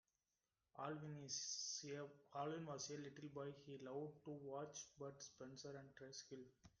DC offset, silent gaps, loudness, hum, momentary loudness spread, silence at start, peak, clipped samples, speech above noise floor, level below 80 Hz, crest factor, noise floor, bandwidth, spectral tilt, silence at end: under 0.1%; none; -52 LUFS; none; 10 LU; 0.75 s; -36 dBFS; under 0.1%; over 37 dB; -86 dBFS; 18 dB; under -90 dBFS; 10.5 kHz; -3.5 dB/octave; 0.1 s